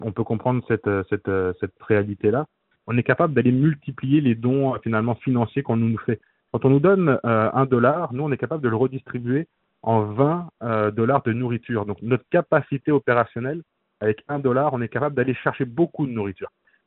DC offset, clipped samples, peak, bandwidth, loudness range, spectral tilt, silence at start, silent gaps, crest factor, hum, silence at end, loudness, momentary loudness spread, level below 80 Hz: under 0.1%; under 0.1%; -2 dBFS; 4.1 kHz; 3 LU; -7.5 dB/octave; 0 s; none; 20 dB; none; 0.4 s; -22 LUFS; 9 LU; -60 dBFS